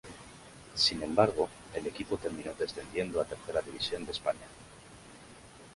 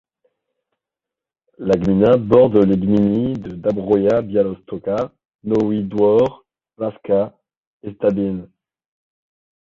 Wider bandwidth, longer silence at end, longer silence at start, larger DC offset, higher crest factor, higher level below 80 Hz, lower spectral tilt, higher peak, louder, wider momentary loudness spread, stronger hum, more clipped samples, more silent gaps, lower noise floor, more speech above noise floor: first, 11.5 kHz vs 7.2 kHz; second, 0 s vs 1.2 s; second, 0.05 s vs 1.6 s; neither; first, 24 dB vs 18 dB; second, -58 dBFS vs -48 dBFS; second, -4 dB/octave vs -9.5 dB/octave; second, -10 dBFS vs 0 dBFS; second, -33 LUFS vs -18 LUFS; first, 24 LU vs 14 LU; neither; neither; second, none vs 5.35-5.39 s, 7.57-7.80 s; second, -53 dBFS vs -87 dBFS; second, 20 dB vs 71 dB